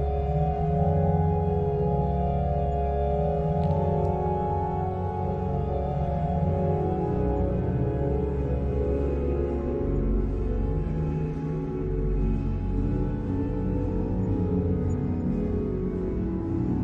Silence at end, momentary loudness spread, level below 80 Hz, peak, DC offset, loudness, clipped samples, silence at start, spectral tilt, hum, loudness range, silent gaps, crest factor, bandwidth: 0 s; 4 LU; -32 dBFS; -10 dBFS; under 0.1%; -27 LUFS; under 0.1%; 0 s; -11 dB/octave; none; 3 LU; none; 14 dB; 4.7 kHz